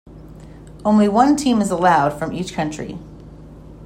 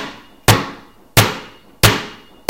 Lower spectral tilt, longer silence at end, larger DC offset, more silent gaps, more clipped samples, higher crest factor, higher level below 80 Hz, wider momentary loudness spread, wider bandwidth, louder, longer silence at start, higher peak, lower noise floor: first, -5.5 dB/octave vs -3.5 dB/octave; second, 0 s vs 0.35 s; neither; neither; second, under 0.1% vs 0.1%; about the same, 18 dB vs 18 dB; second, -44 dBFS vs -34 dBFS; second, 14 LU vs 17 LU; second, 13.5 kHz vs over 20 kHz; about the same, -17 LUFS vs -15 LUFS; about the same, 0.05 s vs 0 s; about the same, -2 dBFS vs 0 dBFS; about the same, -39 dBFS vs -37 dBFS